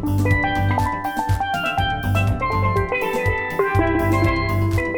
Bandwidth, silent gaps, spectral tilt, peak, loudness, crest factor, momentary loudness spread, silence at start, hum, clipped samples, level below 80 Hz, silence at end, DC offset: 19 kHz; none; -6.5 dB/octave; -4 dBFS; -20 LUFS; 16 dB; 3 LU; 0 s; none; under 0.1%; -32 dBFS; 0 s; under 0.1%